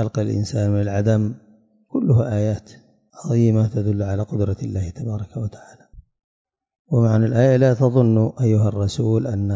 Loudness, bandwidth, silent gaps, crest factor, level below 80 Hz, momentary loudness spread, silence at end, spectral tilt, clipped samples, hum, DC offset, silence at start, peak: -20 LUFS; 7.8 kHz; 6.24-6.45 s, 6.79-6.85 s; 16 dB; -42 dBFS; 12 LU; 0 s; -8.5 dB/octave; under 0.1%; none; under 0.1%; 0 s; -4 dBFS